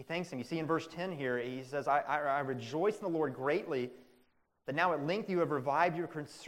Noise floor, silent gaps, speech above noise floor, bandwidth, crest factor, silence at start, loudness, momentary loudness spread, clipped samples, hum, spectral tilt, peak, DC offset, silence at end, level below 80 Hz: -72 dBFS; none; 37 dB; 16 kHz; 20 dB; 0 s; -35 LUFS; 7 LU; under 0.1%; none; -6 dB/octave; -14 dBFS; under 0.1%; 0 s; -76 dBFS